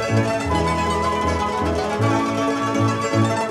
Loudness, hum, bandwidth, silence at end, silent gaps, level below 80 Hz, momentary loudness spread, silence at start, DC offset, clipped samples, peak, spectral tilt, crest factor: -20 LUFS; none; 13.5 kHz; 0 s; none; -36 dBFS; 2 LU; 0 s; under 0.1%; under 0.1%; -6 dBFS; -6 dB/octave; 14 dB